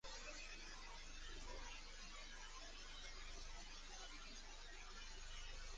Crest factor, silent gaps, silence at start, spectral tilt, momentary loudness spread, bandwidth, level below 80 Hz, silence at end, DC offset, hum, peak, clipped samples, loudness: 14 dB; none; 0.05 s; -1.5 dB/octave; 2 LU; 10 kHz; -58 dBFS; 0 s; under 0.1%; none; -40 dBFS; under 0.1%; -55 LUFS